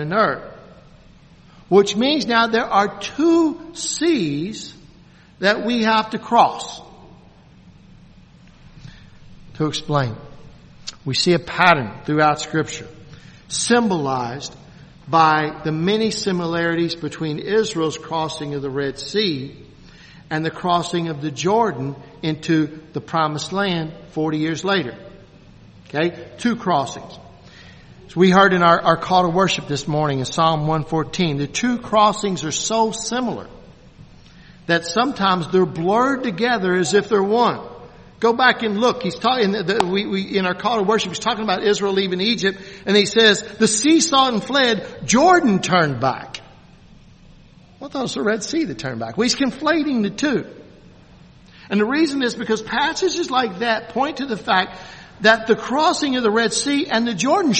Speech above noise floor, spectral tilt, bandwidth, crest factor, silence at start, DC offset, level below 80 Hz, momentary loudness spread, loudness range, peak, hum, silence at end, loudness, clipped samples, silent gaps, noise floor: 29 dB; -4 dB/octave; 8.8 kHz; 20 dB; 0 s; under 0.1%; -52 dBFS; 12 LU; 7 LU; 0 dBFS; none; 0 s; -19 LUFS; under 0.1%; none; -48 dBFS